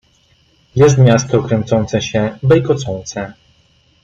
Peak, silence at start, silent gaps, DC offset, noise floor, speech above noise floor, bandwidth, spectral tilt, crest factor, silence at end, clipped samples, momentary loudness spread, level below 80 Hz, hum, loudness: -2 dBFS; 0.75 s; none; under 0.1%; -54 dBFS; 41 dB; 7.6 kHz; -6.5 dB/octave; 14 dB; 0.7 s; under 0.1%; 14 LU; -44 dBFS; none; -14 LUFS